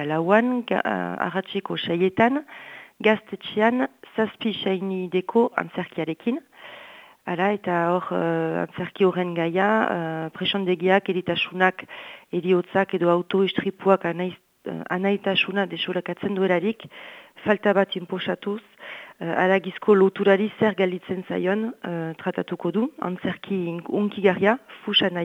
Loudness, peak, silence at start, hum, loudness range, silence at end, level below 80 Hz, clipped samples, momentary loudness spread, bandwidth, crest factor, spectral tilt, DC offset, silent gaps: -23 LUFS; -2 dBFS; 0 s; none; 4 LU; 0 s; -70 dBFS; under 0.1%; 12 LU; 7.6 kHz; 22 dB; -7.5 dB/octave; under 0.1%; none